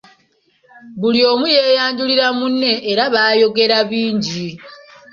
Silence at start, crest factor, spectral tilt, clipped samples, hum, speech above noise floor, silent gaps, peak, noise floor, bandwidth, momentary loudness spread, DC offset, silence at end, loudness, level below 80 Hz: 0.85 s; 16 dB; -4.5 dB/octave; under 0.1%; none; 44 dB; none; -2 dBFS; -59 dBFS; 7.4 kHz; 9 LU; under 0.1%; 0.4 s; -14 LUFS; -60 dBFS